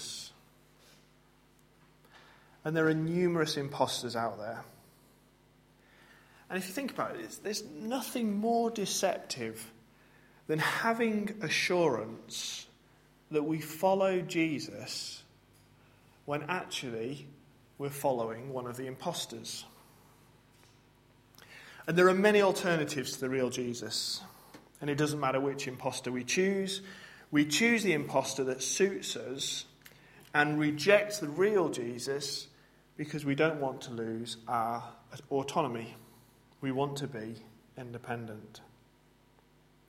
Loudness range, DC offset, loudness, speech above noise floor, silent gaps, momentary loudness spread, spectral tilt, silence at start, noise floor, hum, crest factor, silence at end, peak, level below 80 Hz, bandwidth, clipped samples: 9 LU; under 0.1%; -32 LUFS; 32 dB; none; 16 LU; -4 dB/octave; 0 s; -64 dBFS; none; 24 dB; 1.25 s; -10 dBFS; -72 dBFS; 16 kHz; under 0.1%